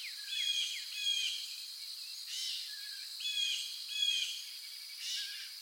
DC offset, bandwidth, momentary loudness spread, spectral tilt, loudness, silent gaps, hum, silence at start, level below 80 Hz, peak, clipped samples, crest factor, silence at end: under 0.1%; 17 kHz; 10 LU; 11 dB/octave; -36 LUFS; none; none; 0 s; under -90 dBFS; -22 dBFS; under 0.1%; 18 dB; 0 s